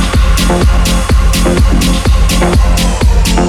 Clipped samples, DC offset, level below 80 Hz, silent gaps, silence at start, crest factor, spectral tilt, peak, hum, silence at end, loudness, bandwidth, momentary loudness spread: under 0.1%; under 0.1%; -10 dBFS; none; 0 s; 8 dB; -5 dB/octave; 0 dBFS; none; 0 s; -10 LUFS; 15.5 kHz; 1 LU